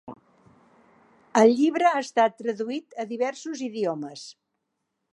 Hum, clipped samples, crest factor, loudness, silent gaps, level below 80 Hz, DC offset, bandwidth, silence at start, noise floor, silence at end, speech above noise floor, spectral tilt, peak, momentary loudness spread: none; under 0.1%; 20 dB; -24 LUFS; none; -80 dBFS; under 0.1%; 11 kHz; 0.05 s; -79 dBFS; 0.8 s; 55 dB; -4.5 dB/octave; -6 dBFS; 18 LU